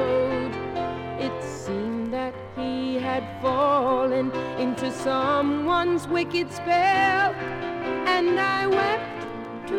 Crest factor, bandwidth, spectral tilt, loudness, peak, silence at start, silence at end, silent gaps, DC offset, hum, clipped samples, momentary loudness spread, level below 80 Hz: 14 dB; 14 kHz; -5.5 dB/octave; -25 LUFS; -10 dBFS; 0 s; 0 s; none; under 0.1%; none; under 0.1%; 9 LU; -54 dBFS